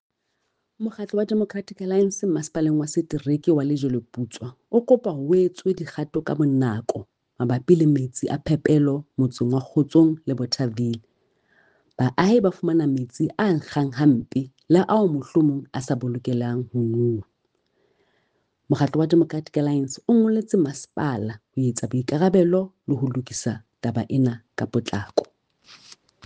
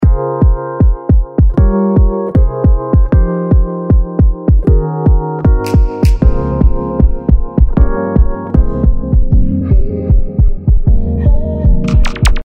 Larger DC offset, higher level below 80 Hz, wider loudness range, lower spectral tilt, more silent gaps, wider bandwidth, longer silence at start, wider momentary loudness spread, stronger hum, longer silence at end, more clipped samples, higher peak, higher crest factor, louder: neither; second, -60 dBFS vs -12 dBFS; first, 4 LU vs 1 LU; second, -7 dB/octave vs -8.5 dB/octave; neither; about the same, 9.6 kHz vs 9.6 kHz; first, 0.8 s vs 0 s; first, 10 LU vs 3 LU; neither; first, 0.5 s vs 0.05 s; second, under 0.1% vs 0.4%; second, -4 dBFS vs 0 dBFS; first, 20 dB vs 10 dB; second, -23 LUFS vs -13 LUFS